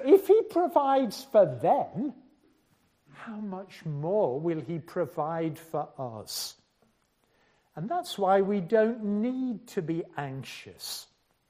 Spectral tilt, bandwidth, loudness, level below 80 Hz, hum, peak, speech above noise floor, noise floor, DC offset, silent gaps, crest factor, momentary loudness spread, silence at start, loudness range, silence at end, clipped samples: -6 dB/octave; 15.5 kHz; -28 LUFS; -74 dBFS; none; -8 dBFS; 41 dB; -70 dBFS; under 0.1%; none; 20 dB; 15 LU; 0 s; 7 LU; 0.45 s; under 0.1%